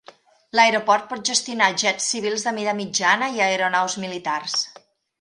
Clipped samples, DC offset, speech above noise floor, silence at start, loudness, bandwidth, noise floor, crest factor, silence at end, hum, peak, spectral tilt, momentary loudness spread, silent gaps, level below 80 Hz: under 0.1%; under 0.1%; 29 dB; 0.55 s; -21 LUFS; 11.5 kHz; -50 dBFS; 22 dB; 0.5 s; none; 0 dBFS; -1.5 dB/octave; 8 LU; none; -72 dBFS